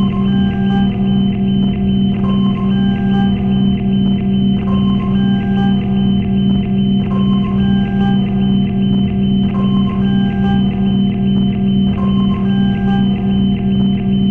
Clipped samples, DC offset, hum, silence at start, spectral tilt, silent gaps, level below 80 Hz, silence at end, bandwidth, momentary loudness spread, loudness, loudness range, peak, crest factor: under 0.1%; under 0.1%; none; 0 s; -10 dB/octave; none; -30 dBFS; 0 s; 3.3 kHz; 0 LU; -14 LUFS; 0 LU; -2 dBFS; 10 dB